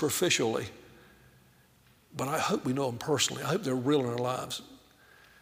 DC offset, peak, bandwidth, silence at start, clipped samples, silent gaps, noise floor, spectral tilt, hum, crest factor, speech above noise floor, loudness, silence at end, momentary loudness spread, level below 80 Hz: under 0.1%; -12 dBFS; 16 kHz; 0 s; under 0.1%; none; -63 dBFS; -4 dB/octave; none; 20 dB; 33 dB; -30 LUFS; 0.65 s; 12 LU; -68 dBFS